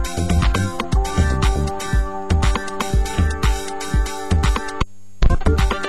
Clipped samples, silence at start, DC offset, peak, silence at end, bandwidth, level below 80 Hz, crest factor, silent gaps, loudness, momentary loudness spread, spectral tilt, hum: under 0.1%; 0 s; 3%; -4 dBFS; 0 s; 12.5 kHz; -20 dBFS; 14 dB; none; -21 LUFS; 5 LU; -5.5 dB/octave; none